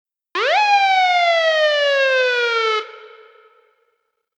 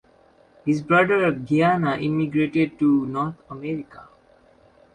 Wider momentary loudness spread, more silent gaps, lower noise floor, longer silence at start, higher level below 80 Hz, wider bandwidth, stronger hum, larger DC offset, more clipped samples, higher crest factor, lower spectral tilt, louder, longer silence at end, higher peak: second, 8 LU vs 12 LU; neither; first, -70 dBFS vs -56 dBFS; second, 0.35 s vs 0.65 s; second, under -90 dBFS vs -58 dBFS; about the same, 9.2 kHz vs 9.4 kHz; neither; neither; neither; about the same, 14 dB vs 18 dB; second, 3 dB/octave vs -8 dB/octave; first, -16 LUFS vs -22 LUFS; first, 1.3 s vs 0.9 s; about the same, -6 dBFS vs -4 dBFS